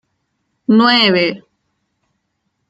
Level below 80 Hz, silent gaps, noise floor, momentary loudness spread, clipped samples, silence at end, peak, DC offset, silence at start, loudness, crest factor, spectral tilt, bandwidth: -64 dBFS; none; -70 dBFS; 15 LU; under 0.1%; 1.3 s; -2 dBFS; under 0.1%; 0.7 s; -12 LUFS; 16 dB; -6 dB/octave; 7.8 kHz